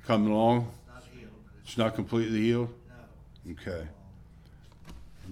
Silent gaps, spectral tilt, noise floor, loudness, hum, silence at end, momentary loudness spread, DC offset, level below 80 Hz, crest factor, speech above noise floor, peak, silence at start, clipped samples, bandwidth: none; -7 dB/octave; -53 dBFS; -29 LUFS; none; 0 s; 26 LU; under 0.1%; -54 dBFS; 20 dB; 25 dB; -12 dBFS; 0.05 s; under 0.1%; 13 kHz